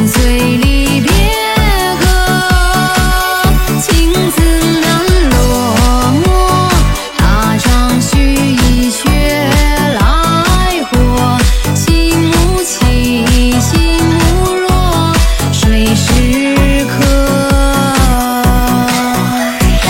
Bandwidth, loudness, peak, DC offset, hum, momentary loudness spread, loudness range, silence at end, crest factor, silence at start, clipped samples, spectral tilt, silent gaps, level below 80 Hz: 16.5 kHz; -10 LUFS; 0 dBFS; under 0.1%; none; 2 LU; 1 LU; 0 s; 10 dB; 0 s; under 0.1%; -4.5 dB/octave; none; -14 dBFS